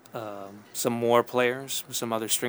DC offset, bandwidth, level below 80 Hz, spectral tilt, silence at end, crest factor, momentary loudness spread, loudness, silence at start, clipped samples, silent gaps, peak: under 0.1%; over 20 kHz; -76 dBFS; -3 dB/octave; 0 s; 22 dB; 15 LU; -27 LUFS; 0.15 s; under 0.1%; none; -6 dBFS